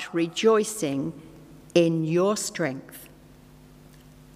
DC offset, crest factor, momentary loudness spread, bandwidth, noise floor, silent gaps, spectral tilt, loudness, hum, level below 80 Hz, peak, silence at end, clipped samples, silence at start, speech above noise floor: under 0.1%; 20 dB; 19 LU; 15.5 kHz; -51 dBFS; none; -5 dB/octave; -24 LUFS; none; -60 dBFS; -6 dBFS; 1.3 s; under 0.1%; 0 s; 26 dB